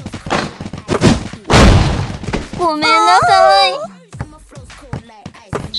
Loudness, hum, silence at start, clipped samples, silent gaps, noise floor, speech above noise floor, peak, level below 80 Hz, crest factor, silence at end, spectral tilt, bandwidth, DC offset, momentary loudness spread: -12 LUFS; none; 0 s; under 0.1%; none; -36 dBFS; 26 dB; 0 dBFS; -24 dBFS; 14 dB; 0 s; -5 dB/octave; 12 kHz; under 0.1%; 21 LU